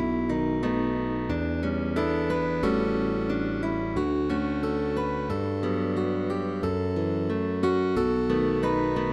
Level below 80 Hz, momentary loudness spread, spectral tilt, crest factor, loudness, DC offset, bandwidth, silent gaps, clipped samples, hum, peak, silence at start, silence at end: -42 dBFS; 4 LU; -8 dB/octave; 14 dB; -27 LUFS; 0.3%; 11.5 kHz; none; under 0.1%; none; -12 dBFS; 0 s; 0 s